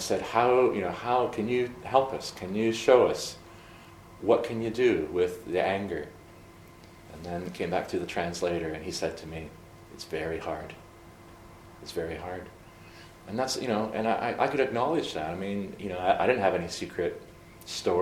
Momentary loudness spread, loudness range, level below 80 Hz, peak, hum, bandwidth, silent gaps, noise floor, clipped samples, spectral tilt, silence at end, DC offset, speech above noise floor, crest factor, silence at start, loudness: 21 LU; 11 LU; -56 dBFS; -6 dBFS; none; 17 kHz; none; -51 dBFS; under 0.1%; -5 dB/octave; 0 s; under 0.1%; 22 dB; 22 dB; 0 s; -29 LUFS